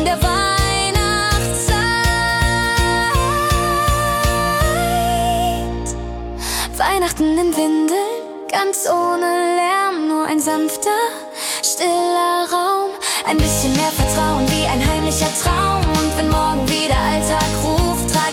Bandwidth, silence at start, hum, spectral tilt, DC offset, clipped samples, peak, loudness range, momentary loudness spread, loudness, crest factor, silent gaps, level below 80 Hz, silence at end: 17.5 kHz; 0 s; none; -4 dB/octave; under 0.1%; under 0.1%; -2 dBFS; 2 LU; 4 LU; -17 LUFS; 14 dB; none; -26 dBFS; 0 s